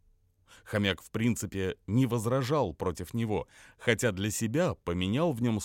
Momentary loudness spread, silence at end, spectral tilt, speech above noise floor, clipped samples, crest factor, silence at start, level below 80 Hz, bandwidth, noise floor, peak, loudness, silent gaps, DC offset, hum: 6 LU; 0 s; -5.5 dB/octave; 36 dB; under 0.1%; 20 dB; 0.5 s; -56 dBFS; 17 kHz; -66 dBFS; -10 dBFS; -30 LUFS; none; under 0.1%; none